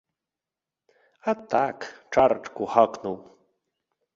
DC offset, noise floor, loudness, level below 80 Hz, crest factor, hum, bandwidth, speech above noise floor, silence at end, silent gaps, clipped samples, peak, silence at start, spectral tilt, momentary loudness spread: under 0.1%; -89 dBFS; -25 LUFS; -64 dBFS; 24 dB; none; 7.6 kHz; 65 dB; 0.95 s; none; under 0.1%; -4 dBFS; 1.25 s; -5.5 dB/octave; 13 LU